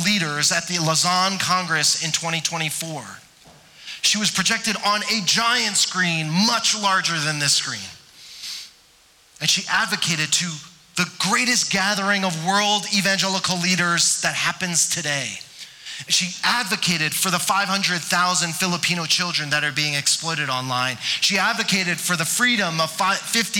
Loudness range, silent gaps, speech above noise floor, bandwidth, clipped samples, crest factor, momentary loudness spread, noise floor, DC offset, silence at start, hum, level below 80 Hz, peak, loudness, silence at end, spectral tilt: 3 LU; none; 33 dB; 18.5 kHz; under 0.1%; 14 dB; 10 LU; -54 dBFS; under 0.1%; 0 s; none; -64 dBFS; -8 dBFS; -19 LUFS; 0 s; -2 dB/octave